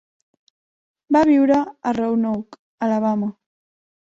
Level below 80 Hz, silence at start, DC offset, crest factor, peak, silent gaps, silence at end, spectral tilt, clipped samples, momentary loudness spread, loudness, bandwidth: -60 dBFS; 1.1 s; under 0.1%; 18 dB; -4 dBFS; 2.59-2.78 s; 0.8 s; -7.5 dB/octave; under 0.1%; 11 LU; -20 LUFS; 7.8 kHz